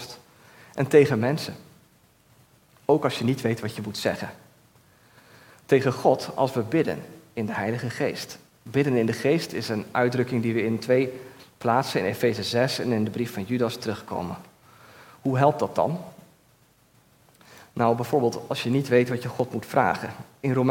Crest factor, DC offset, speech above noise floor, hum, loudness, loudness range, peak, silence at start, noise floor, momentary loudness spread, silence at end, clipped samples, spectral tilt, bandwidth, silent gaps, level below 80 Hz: 22 dB; under 0.1%; 36 dB; none; -25 LUFS; 4 LU; -4 dBFS; 0 s; -60 dBFS; 14 LU; 0 s; under 0.1%; -6 dB/octave; 17 kHz; none; -68 dBFS